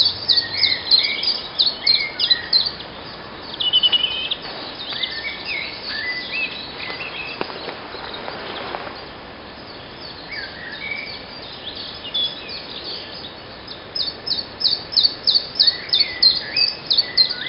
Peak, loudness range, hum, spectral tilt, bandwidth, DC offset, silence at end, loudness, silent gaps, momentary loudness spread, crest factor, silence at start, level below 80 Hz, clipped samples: -2 dBFS; 14 LU; none; -6.5 dB/octave; 5.8 kHz; under 0.1%; 0 s; -19 LUFS; none; 19 LU; 20 dB; 0 s; -52 dBFS; under 0.1%